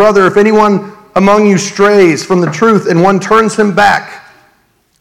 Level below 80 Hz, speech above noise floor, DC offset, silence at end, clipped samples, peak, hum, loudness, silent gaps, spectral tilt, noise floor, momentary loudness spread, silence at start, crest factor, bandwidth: -46 dBFS; 46 dB; 0.7%; 0.8 s; 2%; 0 dBFS; none; -9 LUFS; none; -5.5 dB/octave; -54 dBFS; 5 LU; 0 s; 8 dB; 13.5 kHz